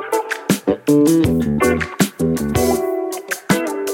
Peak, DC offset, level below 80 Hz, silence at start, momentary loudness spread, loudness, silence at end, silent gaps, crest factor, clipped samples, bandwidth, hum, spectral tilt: 0 dBFS; under 0.1%; -38 dBFS; 0 s; 7 LU; -17 LUFS; 0 s; none; 16 dB; under 0.1%; 17 kHz; none; -5.5 dB/octave